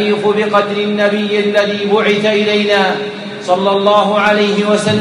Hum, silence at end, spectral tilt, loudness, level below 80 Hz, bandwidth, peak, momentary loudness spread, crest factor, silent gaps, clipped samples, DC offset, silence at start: none; 0 s; -5 dB/octave; -12 LUFS; -60 dBFS; 11 kHz; 0 dBFS; 5 LU; 12 dB; none; under 0.1%; under 0.1%; 0 s